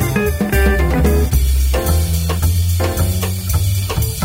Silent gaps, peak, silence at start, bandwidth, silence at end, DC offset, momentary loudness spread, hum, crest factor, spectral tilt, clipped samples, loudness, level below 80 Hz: none; -2 dBFS; 0 s; 16.5 kHz; 0 s; under 0.1%; 3 LU; none; 12 dB; -5.5 dB/octave; under 0.1%; -16 LUFS; -18 dBFS